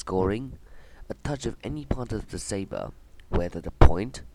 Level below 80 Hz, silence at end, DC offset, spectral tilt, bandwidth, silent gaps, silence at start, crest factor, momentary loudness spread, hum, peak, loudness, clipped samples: -30 dBFS; 0.05 s; under 0.1%; -6.5 dB/octave; 11 kHz; none; 0.05 s; 26 dB; 16 LU; none; 0 dBFS; -29 LUFS; under 0.1%